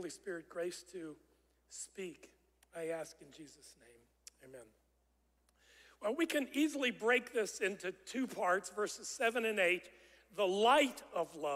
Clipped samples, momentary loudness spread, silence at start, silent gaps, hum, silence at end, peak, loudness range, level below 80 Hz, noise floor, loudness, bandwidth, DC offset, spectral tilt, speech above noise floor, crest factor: under 0.1%; 20 LU; 0 s; none; none; 0 s; -18 dBFS; 16 LU; -78 dBFS; -76 dBFS; -36 LUFS; 16 kHz; under 0.1%; -2.5 dB/octave; 39 dB; 20 dB